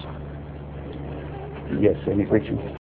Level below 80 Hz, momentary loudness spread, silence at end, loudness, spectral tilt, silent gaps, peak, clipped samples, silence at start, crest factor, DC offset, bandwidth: -40 dBFS; 15 LU; 0.1 s; -26 LUFS; -11.5 dB/octave; none; -4 dBFS; under 0.1%; 0 s; 22 dB; under 0.1%; 4.4 kHz